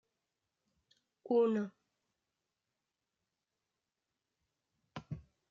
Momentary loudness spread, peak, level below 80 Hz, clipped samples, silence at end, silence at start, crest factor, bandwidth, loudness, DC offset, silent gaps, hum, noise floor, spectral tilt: 21 LU; -22 dBFS; -74 dBFS; under 0.1%; 0.3 s; 1.25 s; 20 dB; 7.2 kHz; -34 LUFS; under 0.1%; none; none; -89 dBFS; -7 dB/octave